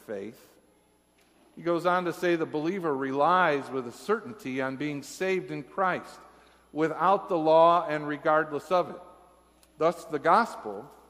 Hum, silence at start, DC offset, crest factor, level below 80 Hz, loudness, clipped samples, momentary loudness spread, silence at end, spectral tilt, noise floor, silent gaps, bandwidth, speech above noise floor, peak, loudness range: none; 0.1 s; under 0.1%; 20 dB; -70 dBFS; -27 LUFS; under 0.1%; 14 LU; 0.2 s; -5.5 dB/octave; -65 dBFS; none; 15.5 kHz; 38 dB; -8 dBFS; 5 LU